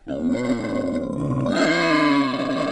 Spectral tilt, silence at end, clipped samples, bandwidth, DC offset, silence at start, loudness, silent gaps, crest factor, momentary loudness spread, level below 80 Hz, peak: -5.5 dB/octave; 0 s; under 0.1%; 11 kHz; under 0.1%; 0.05 s; -21 LUFS; none; 14 dB; 7 LU; -48 dBFS; -8 dBFS